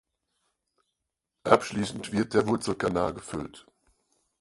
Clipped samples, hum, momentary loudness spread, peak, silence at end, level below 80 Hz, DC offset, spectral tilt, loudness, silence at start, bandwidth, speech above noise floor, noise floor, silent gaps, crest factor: under 0.1%; none; 14 LU; -2 dBFS; 0.8 s; -56 dBFS; under 0.1%; -5.5 dB/octave; -28 LUFS; 1.45 s; 11.5 kHz; 57 dB; -84 dBFS; none; 28 dB